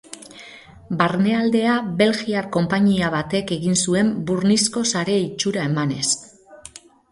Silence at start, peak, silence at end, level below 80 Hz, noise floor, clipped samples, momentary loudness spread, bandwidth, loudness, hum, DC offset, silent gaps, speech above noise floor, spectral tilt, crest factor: 0.1 s; -2 dBFS; 0.35 s; -54 dBFS; -44 dBFS; under 0.1%; 20 LU; 11.5 kHz; -20 LUFS; none; under 0.1%; none; 25 dB; -4.5 dB/octave; 20 dB